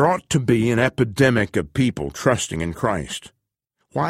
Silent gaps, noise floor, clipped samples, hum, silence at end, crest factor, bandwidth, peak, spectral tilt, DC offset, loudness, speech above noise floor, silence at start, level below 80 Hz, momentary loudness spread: none; -75 dBFS; under 0.1%; none; 0 s; 18 dB; 15.5 kHz; -2 dBFS; -5.5 dB/octave; under 0.1%; -21 LUFS; 55 dB; 0 s; -44 dBFS; 9 LU